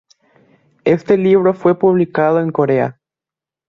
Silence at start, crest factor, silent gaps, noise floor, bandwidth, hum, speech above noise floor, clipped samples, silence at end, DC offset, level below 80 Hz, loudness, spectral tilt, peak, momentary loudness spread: 0.85 s; 14 dB; none; -88 dBFS; 6.6 kHz; none; 75 dB; under 0.1%; 0.75 s; under 0.1%; -56 dBFS; -14 LUFS; -9 dB/octave; -2 dBFS; 5 LU